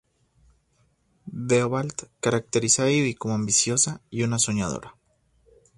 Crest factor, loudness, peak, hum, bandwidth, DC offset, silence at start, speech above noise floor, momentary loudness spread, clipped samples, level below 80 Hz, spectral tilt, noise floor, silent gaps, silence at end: 20 dB; -23 LUFS; -6 dBFS; none; 11.5 kHz; under 0.1%; 1.25 s; 42 dB; 12 LU; under 0.1%; -56 dBFS; -3.5 dB/octave; -66 dBFS; none; 0.85 s